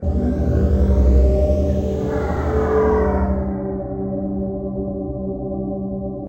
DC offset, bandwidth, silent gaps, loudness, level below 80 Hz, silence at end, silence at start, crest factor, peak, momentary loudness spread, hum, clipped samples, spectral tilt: under 0.1%; 7 kHz; none; -20 LUFS; -22 dBFS; 0 s; 0 s; 14 dB; -4 dBFS; 10 LU; none; under 0.1%; -10 dB/octave